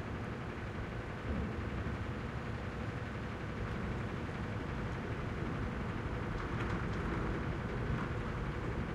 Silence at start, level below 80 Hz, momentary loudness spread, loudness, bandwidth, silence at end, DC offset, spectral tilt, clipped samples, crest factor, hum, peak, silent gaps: 0 s; -46 dBFS; 4 LU; -40 LUFS; 11.5 kHz; 0 s; under 0.1%; -7.5 dB/octave; under 0.1%; 14 dB; none; -24 dBFS; none